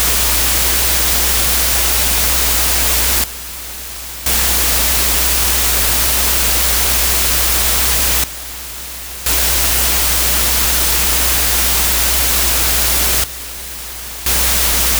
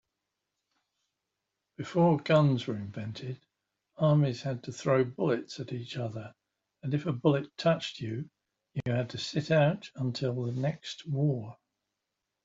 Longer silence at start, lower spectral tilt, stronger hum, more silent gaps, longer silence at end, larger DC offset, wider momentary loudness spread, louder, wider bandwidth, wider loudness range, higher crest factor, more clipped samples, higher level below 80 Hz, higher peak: second, 0 s vs 1.8 s; second, -1 dB/octave vs -7 dB/octave; neither; neither; second, 0 s vs 0.9 s; neither; about the same, 13 LU vs 15 LU; first, -11 LUFS vs -30 LUFS; first, over 20 kHz vs 7.8 kHz; about the same, 2 LU vs 3 LU; second, 14 dB vs 20 dB; neither; first, -24 dBFS vs -70 dBFS; first, 0 dBFS vs -10 dBFS